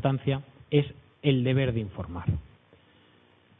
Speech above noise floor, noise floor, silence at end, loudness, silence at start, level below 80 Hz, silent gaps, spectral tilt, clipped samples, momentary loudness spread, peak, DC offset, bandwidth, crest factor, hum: 34 dB; -60 dBFS; 1.15 s; -29 LUFS; 0 s; -50 dBFS; none; -11.5 dB/octave; under 0.1%; 11 LU; -10 dBFS; under 0.1%; 3.9 kHz; 20 dB; none